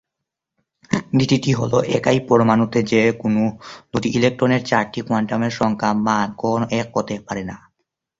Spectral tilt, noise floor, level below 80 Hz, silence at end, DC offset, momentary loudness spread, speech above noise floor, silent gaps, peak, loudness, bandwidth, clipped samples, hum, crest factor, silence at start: -6 dB/octave; -82 dBFS; -52 dBFS; 0.65 s; under 0.1%; 9 LU; 64 dB; none; -2 dBFS; -19 LUFS; 7.8 kHz; under 0.1%; none; 18 dB; 0.9 s